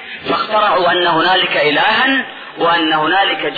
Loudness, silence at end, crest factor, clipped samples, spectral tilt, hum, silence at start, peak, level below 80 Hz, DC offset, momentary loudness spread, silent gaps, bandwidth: -13 LUFS; 0 s; 10 dB; under 0.1%; -6 dB/octave; none; 0 s; -4 dBFS; -54 dBFS; under 0.1%; 7 LU; none; 4.9 kHz